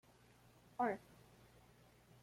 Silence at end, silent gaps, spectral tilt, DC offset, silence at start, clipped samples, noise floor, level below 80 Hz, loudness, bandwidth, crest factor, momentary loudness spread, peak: 1.25 s; none; -6.5 dB/octave; under 0.1%; 0.8 s; under 0.1%; -68 dBFS; -76 dBFS; -43 LUFS; 16.5 kHz; 22 dB; 26 LU; -28 dBFS